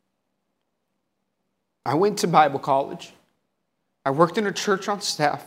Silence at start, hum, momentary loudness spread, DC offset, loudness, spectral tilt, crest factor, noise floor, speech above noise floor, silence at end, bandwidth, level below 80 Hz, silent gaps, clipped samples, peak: 1.85 s; none; 12 LU; under 0.1%; -22 LUFS; -4.5 dB/octave; 22 dB; -77 dBFS; 55 dB; 0 s; 16 kHz; -74 dBFS; none; under 0.1%; -2 dBFS